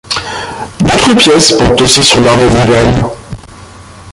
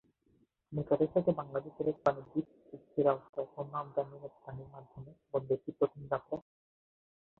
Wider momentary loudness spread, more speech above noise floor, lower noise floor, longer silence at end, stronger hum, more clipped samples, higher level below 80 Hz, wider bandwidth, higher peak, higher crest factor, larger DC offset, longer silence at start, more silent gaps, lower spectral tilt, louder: about the same, 16 LU vs 18 LU; second, 25 dB vs 37 dB; second, -31 dBFS vs -72 dBFS; second, 0 s vs 1 s; neither; first, 0.2% vs under 0.1%; first, -26 dBFS vs -70 dBFS; first, 16 kHz vs 6 kHz; first, 0 dBFS vs -14 dBFS; second, 8 dB vs 22 dB; neither; second, 0.1 s vs 0.7 s; second, none vs 3.29-3.33 s; second, -4 dB/octave vs -10 dB/octave; first, -7 LUFS vs -35 LUFS